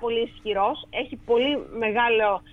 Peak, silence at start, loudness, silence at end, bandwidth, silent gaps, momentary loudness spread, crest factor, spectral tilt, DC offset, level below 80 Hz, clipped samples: -10 dBFS; 0 s; -24 LUFS; 0.1 s; 4.1 kHz; none; 9 LU; 16 dB; -6 dB/octave; under 0.1%; -52 dBFS; under 0.1%